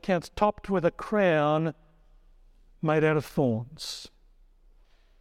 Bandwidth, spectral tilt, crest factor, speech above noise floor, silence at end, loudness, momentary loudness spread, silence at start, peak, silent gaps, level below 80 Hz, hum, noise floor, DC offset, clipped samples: 15.5 kHz; -6.5 dB/octave; 18 dB; 32 dB; 1.15 s; -27 LUFS; 13 LU; 0.05 s; -10 dBFS; none; -54 dBFS; none; -58 dBFS; under 0.1%; under 0.1%